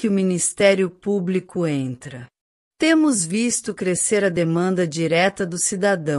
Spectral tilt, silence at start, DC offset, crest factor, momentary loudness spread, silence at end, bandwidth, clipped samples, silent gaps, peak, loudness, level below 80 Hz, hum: -4.5 dB/octave; 0 s; under 0.1%; 18 dB; 7 LU; 0 s; 13.5 kHz; under 0.1%; 2.41-2.71 s; -2 dBFS; -20 LUFS; -60 dBFS; none